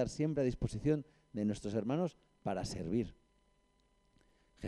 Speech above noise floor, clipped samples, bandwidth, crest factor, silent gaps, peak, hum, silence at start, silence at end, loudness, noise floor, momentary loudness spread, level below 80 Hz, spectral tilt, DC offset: 37 dB; under 0.1%; 12 kHz; 18 dB; none; -22 dBFS; 50 Hz at -65 dBFS; 0 s; 0 s; -38 LUFS; -73 dBFS; 7 LU; -56 dBFS; -7 dB/octave; under 0.1%